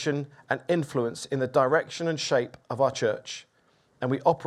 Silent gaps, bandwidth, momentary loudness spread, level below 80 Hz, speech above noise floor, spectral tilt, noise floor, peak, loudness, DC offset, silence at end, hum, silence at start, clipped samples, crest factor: none; 13 kHz; 10 LU; -70 dBFS; 38 dB; -5 dB/octave; -65 dBFS; -8 dBFS; -27 LUFS; under 0.1%; 0 s; none; 0 s; under 0.1%; 20 dB